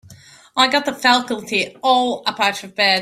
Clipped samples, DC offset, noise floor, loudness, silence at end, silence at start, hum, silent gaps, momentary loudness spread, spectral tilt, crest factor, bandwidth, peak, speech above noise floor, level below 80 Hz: under 0.1%; under 0.1%; -45 dBFS; -17 LUFS; 0 s; 0.1 s; none; none; 6 LU; -2 dB/octave; 18 dB; 15.5 kHz; 0 dBFS; 27 dB; -64 dBFS